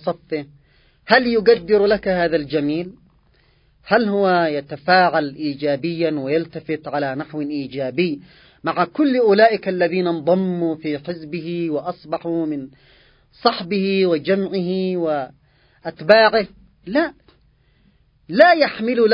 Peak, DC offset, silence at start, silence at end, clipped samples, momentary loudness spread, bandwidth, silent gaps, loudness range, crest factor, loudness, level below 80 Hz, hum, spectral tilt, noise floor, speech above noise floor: 0 dBFS; under 0.1%; 0.05 s; 0 s; under 0.1%; 14 LU; 5.4 kHz; none; 5 LU; 20 dB; -19 LUFS; -56 dBFS; none; -8.5 dB/octave; -57 dBFS; 39 dB